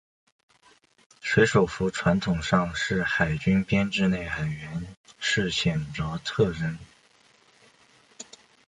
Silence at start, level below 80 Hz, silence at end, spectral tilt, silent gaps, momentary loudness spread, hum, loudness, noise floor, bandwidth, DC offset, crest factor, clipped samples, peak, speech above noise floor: 1.25 s; -48 dBFS; 0.45 s; -5.5 dB/octave; 4.97-5.04 s; 14 LU; none; -26 LUFS; -60 dBFS; 10 kHz; under 0.1%; 20 dB; under 0.1%; -8 dBFS; 35 dB